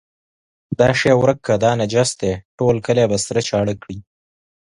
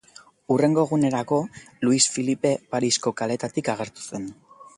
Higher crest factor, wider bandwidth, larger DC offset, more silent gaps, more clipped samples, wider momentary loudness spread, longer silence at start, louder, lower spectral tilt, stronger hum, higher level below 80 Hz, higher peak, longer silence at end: about the same, 18 dB vs 20 dB; about the same, 11.5 kHz vs 11.5 kHz; neither; first, 2.45-2.58 s vs none; neither; about the same, 12 LU vs 14 LU; first, 0.7 s vs 0.5 s; first, -17 LUFS vs -23 LUFS; about the same, -5 dB/octave vs -4 dB/octave; neither; first, -46 dBFS vs -64 dBFS; first, 0 dBFS vs -4 dBFS; first, 0.75 s vs 0.1 s